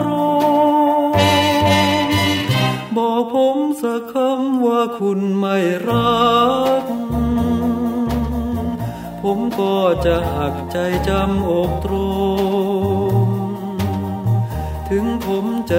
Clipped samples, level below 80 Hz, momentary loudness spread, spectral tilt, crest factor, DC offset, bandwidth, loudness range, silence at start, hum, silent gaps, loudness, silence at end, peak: under 0.1%; -34 dBFS; 8 LU; -6 dB/octave; 16 dB; under 0.1%; 16 kHz; 4 LU; 0 s; none; none; -18 LUFS; 0 s; -2 dBFS